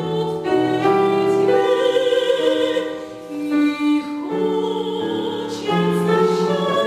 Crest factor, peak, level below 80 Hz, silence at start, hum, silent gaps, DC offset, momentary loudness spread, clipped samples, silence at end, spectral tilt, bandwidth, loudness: 14 dB; -4 dBFS; -60 dBFS; 0 s; none; none; under 0.1%; 8 LU; under 0.1%; 0 s; -6 dB/octave; 15 kHz; -19 LUFS